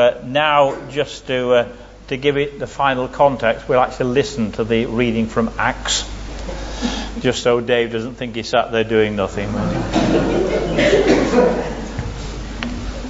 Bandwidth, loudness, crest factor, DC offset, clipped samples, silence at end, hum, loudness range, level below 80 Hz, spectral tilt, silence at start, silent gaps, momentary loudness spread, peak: 8 kHz; -18 LUFS; 16 dB; under 0.1%; under 0.1%; 0 s; none; 3 LU; -34 dBFS; -5 dB/octave; 0 s; none; 12 LU; -2 dBFS